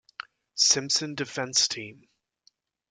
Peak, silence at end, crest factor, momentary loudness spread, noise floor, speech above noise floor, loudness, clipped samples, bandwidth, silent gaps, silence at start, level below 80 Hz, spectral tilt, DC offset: -8 dBFS; 1 s; 22 dB; 22 LU; -67 dBFS; 40 dB; -24 LUFS; under 0.1%; 11.5 kHz; none; 0.55 s; -74 dBFS; -1 dB/octave; under 0.1%